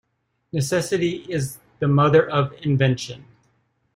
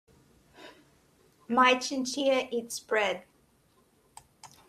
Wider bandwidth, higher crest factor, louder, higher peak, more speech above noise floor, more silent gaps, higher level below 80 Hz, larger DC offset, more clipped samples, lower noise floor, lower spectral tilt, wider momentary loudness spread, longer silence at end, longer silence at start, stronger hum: first, 16 kHz vs 14.5 kHz; about the same, 18 dB vs 22 dB; first, -21 LUFS vs -28 LUFS; first, -4 dBFS vs -10 dBFS; first, 49 dB vs 39 dB; neither; first, -56 dBFS vs -72 dBFS; neither; neither; about the same, -69 dBFS vs -66 dBFS; first, -6 dB/octave vs -2 dB/octave; first, 14 LU vs 11 LU; first, 0.75 s vs 0.25 s; about the same, 0.55 s vs 0.6 s; neither